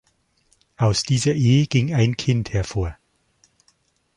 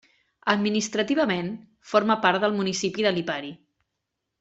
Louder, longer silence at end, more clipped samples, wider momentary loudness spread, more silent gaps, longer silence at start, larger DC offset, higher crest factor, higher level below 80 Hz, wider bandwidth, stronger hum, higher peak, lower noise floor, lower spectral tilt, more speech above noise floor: first, -20 LUFS vs -24 LUFS; first, 1.25 s vs 0.85 s; neither; about the same, 9 LU vs 11 LU; neither; first, 0.8 s vs 0.45 s; neither; second, 16 dB vs 22 dB; first, -42 dBFS vs -66 dBFS; first, 11.5 kHz vs 8.2 kHz; neither; about the same, -6 dBFS vs -4 dBFS; second, -64 dBFS vs -82 dBFS; first, -5.5 dB/octave vs -4 dB/octave; second, 45 dB vs 58 dB